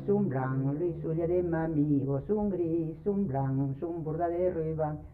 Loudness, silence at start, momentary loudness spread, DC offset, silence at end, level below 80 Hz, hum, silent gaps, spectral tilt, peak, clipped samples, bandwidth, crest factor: -31 LUFS; 0 s; 4 LU; under 0.1%; 0 s; -52 dBFS; none; none; -12.5 dB/octave; -16 dBFS; under 0.1%; 3.1 kHz; 12 dB